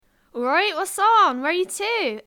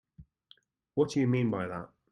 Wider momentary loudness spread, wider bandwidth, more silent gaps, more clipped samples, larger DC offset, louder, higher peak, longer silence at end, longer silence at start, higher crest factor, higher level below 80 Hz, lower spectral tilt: about the same, 8 LU vs 10 LU; first, 18.5 kHz vs 11 kHz; neither; neither; neither; first, -20 LUFS vs -30 LUFS; first, -6 dBFS vs -14 dBFS; second, 0.05 s vs 0.25 s; first, 0.35 s vs 0.2 s; about the same, 14 dB vs 18 dB; about the same, -70 dBFS vs -66 dBFS; second, -1 dB/octave vs -7.5 dB/octave